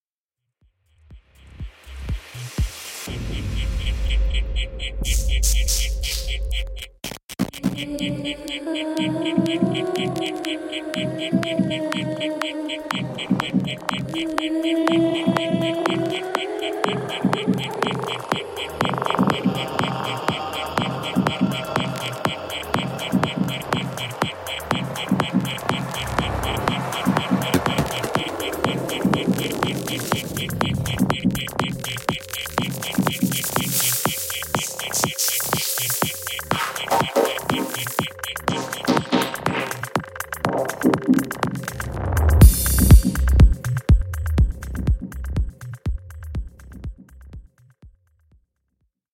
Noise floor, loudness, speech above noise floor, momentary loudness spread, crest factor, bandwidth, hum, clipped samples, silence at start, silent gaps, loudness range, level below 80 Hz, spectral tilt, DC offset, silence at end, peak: -83 dBFS; -23 LUFS; 60 dB; 9 LU; 22 dB; 17 kHz; none; under 0.1%; 1.1 s; 7.24-7.28 s; 9 LU; -28 dBFS; -4.5 dB/octave; under 0.1%; 1.25 s; 0 dBFS